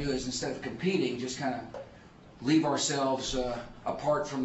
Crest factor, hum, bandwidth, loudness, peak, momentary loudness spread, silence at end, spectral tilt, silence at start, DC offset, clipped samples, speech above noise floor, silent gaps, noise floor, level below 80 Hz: 16 dB; none; 8 kHz; -31 LUFS; -16 dBFS; 11 LU; 0 s; -4 dB/octave; 0 s; under 0.1%; under 0.1%; 22 dB; none; -53 dBFS; -52 dBFS